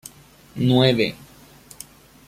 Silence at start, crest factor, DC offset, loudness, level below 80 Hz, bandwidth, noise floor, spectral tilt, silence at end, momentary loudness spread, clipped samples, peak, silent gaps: 0.55 s; 20 dB; under 0.1%; -19 LUFS; -54 dBFS; 15.5 kHz; -48 dBFS; -6 dB/octave; 1.15 s; 24 LU; under 0.1%; -2 dBFS; none